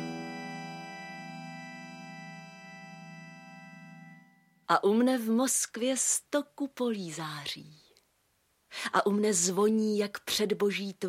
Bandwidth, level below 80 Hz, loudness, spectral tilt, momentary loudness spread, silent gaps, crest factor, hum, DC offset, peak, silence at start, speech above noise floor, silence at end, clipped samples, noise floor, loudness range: 16.5 kHz; -78 dBFS; -29 LUFS; -3.5 dB/octave; 21 LU; none; 22 dB; none; under 0.1%; -10 dBFS; 0 s; 43 dB; 0 s; under 0.1%; -72 dBFS; 16 LU